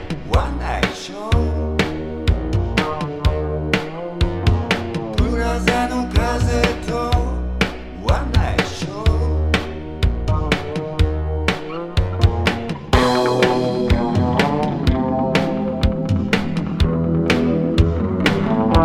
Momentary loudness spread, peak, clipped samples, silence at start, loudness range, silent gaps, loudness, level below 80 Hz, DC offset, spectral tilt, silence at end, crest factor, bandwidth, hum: 6 LU; 0 dBFS; under 0.1%; 0 s; 3 LU; none; -20 LUFS; -24 dBFS; under 0.1%; -6.5 dB/octave; 0 s; 18 dB; 13.5 kHz; none